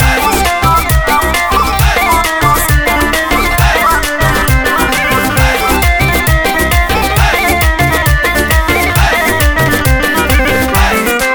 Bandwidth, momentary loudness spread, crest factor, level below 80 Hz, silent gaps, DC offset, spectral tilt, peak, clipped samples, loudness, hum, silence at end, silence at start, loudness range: over 20 kHz; 1 LU; 10 dB; -16 dBFS; none; under 0.1%; -4 dB/octave; 0 dBFS; under 0.1%; -10 LUFS; none; 0 s; 0 s; 0 LU